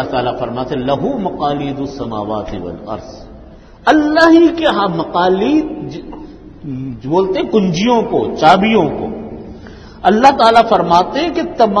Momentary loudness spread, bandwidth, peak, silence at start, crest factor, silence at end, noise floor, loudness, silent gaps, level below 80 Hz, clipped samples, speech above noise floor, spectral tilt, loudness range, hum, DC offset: 18 LU; 9.6 kHz; 0 dBFS; 0 s; 14 dB; 0 s; -37 dBFS; -13 LUFS; none; -40 dBFS; 0.2%; 24 dB; -6 dB/octave; 7 LU; none; under 0.1%